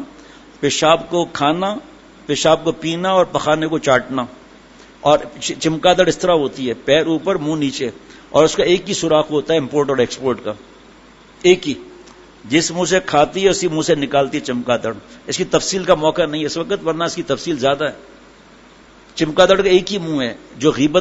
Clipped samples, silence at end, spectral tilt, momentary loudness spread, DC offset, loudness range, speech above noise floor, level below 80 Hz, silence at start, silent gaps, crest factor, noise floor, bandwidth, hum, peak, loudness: under 0.1%; 0 s; -4 dB/octave; 10 LU; under 0.1%; 3 LU; 28 dB; -48 dBFS; 0 s; none; 18 dB; -44 dBFS; 8 kHz; none; 0 dBFS; -17 LUFS